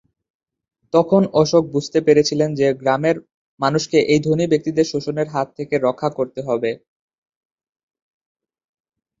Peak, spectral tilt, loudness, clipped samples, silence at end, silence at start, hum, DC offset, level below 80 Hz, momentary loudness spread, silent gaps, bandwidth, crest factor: -2 dBFS; -6 dB/octave; -18 LUFS; under 0.1%; 2.45 s; 0.95 s; none; under 0.1%; -58 dBFS; 8 LU; 3.34-3.58 s; 7.8 kHz; 18 dB